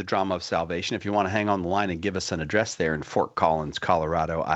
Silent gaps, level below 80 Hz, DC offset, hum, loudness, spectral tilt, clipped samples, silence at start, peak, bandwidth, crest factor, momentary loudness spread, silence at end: none; -50 dBFS; under 0.1%; none; -26 LUFS; -5 dB/octave; under 0.1%; 0 s; -6 dBFS; 8.4 kHz; 20 dB; 4 LU; 0 s